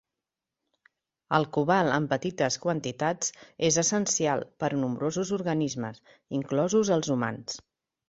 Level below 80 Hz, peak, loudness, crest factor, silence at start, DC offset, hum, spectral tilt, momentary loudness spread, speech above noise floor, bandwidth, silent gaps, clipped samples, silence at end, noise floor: -66 dBFS; -6 dBFS; -27 LUFS; 22 dB; 1.3 s; under 0.1%; none; -4 dB/octave; 10 LU; 61 dB; 8.2 kHz; none; under 0.1%; 0.5 s; -88 dBFS